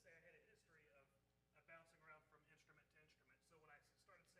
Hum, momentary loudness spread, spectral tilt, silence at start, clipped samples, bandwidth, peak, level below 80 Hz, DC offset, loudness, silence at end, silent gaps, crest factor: 60 Hz at -90 dBFS; 3 LU; -3.5 dB/octave; 0 s; under 0.1%; 11.5 kHz; -52 dBFS; under -90 dBFS; under 0.1%; -68 LUFS; 0 s; none; 20 dB